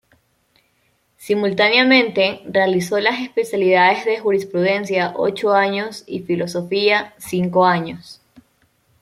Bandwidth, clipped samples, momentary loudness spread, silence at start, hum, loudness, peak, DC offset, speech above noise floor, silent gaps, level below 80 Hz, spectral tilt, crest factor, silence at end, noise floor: 14.5 kHz; under 0.1%; 9 LU; 1.2 s; none; -17 LUFS; -2 dBFS; under 0.1%; 46 dB; none; -62 dBFS; -5 dB/octave; 18 dB; 0.9 s; -63 dBFS